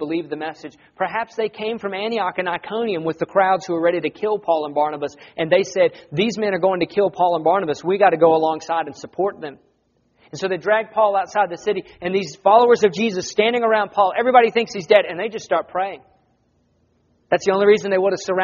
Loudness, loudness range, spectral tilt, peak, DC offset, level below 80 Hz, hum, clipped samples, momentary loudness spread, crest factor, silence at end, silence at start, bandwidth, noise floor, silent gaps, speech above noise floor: -19 LUFS; 5 LU; -3 dB/octave; 0 dBFS; under 0.1%; -64 dBFS; none; under 0.1%; 11 LU; 20 dB; 0 s; 0 s; 7.2 kHz; -64 dBFS; none; 45 dB